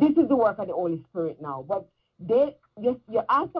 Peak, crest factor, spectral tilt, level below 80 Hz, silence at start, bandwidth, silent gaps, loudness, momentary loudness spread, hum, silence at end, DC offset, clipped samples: -10 dBFS; 16 dB; -9.5 dB/octave; -64 dBFS; 0 s; 5.6 kHz; none; -26 LUFS; 11 LU; none; 0 s; under 0.1%; under 0.1%